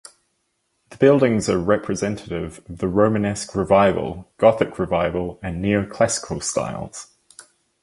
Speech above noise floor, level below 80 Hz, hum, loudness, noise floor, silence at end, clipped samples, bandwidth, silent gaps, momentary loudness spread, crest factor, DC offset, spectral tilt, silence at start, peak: 51 dB; -44 dBFS; none; -20 LUFS; -71 dBFS; 0.4 s; under 0.1%; 11.5 kHz; none; 13 LU; 20 dB; under 0.1%; -5.5 dB/octave; 0.9 s; -2 dBFS